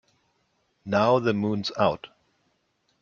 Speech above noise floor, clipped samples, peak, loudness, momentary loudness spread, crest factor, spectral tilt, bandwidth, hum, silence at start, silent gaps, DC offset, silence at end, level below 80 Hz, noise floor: 48 dB; under 0.1%; -8 dBFS; -24 LUFS; 12 LU; 20 dB; -6.5 dB/octave; 7.2 kHz; none; 0.85 s; none; under 0.1%; 0.95 s; -64 dBFS; -71 dBFS